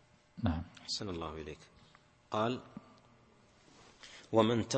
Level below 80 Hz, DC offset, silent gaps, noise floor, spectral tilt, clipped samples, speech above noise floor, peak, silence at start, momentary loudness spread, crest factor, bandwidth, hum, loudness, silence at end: -56 dBFS; under 0.1%; none; -65 dBFS; -5.5 dB/octave; under 0.1%; 30 dB; -12 dBFS; 0.35 s; 23 LU; 24 dB; 8.4 kHz; none; -36 LUFS; 0 s